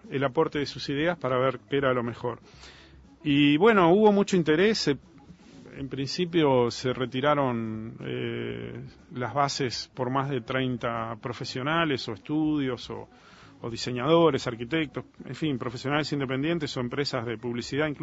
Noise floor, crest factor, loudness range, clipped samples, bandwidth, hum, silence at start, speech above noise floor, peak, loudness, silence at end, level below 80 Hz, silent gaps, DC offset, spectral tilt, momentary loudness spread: -50 dBFS; 20 dB; 7 LU; under 0.1%; 8 kHz; none; 0.05 s; 24 dB; -8 dBFS; -27 LUFS; 0 s; -58 dBFS; none; under 0.1%; -5.5 dB/octave; 14 LU